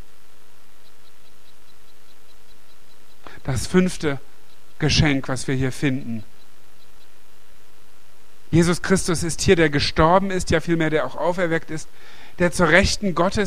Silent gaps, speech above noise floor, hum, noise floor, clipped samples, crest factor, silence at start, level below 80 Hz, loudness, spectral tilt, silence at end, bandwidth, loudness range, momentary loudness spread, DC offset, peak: none; 34 dB; 50 Hz at -50 dBFS; -54 dBFS; under 0.1%; 22 dB; 3.25 s; -38 dBFS; -20 LUFS; -5 dB/octave; 0 s; 15.5 kHz; 9 LU; 12 LU; 4%; 0 dBFS